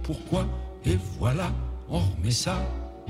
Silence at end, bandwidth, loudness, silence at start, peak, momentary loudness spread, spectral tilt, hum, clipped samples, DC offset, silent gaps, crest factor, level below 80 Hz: 0 s; 15.5 kHz; -28 LUFS; 0 s; -12 dBFS; 6 LU; -5.5 dB/octave; none; under 0.1%; under 0.1%; none; 16 dB; -34 dBFS